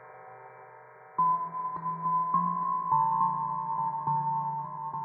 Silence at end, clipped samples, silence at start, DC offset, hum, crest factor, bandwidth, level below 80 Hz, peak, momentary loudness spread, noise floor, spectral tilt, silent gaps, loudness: 0 s; under 0.1%; 0 s; under 0.1%; none; 16 dB; 2.5 kHz; -76 dBFS; -14 dBFS; 22 LU; -51 dBFS; -11.5 dB/octave; none; -29 LUFS